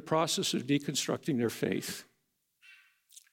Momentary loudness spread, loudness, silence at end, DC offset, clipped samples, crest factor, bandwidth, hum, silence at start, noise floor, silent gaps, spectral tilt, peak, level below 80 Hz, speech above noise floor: 7 LU; -32 LUFS; 0.15 s; under 0.1%; under 0.1%; 18 dB; 17 kHz; none; 0 s; -78 dBFS; none; -4 dB/octave; -16 dBFS; -78 dBFS; 47 dB